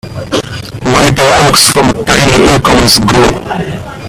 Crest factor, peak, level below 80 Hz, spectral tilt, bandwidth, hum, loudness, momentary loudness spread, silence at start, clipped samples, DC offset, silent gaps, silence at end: 8 dB; 0 dBFS; -26 dBFS; -3.5 dB/octave; over 20 kHz; none; -7 LUFS; 12 LU; 0.05 s; 0.6%; under 0.1%; none; 0 s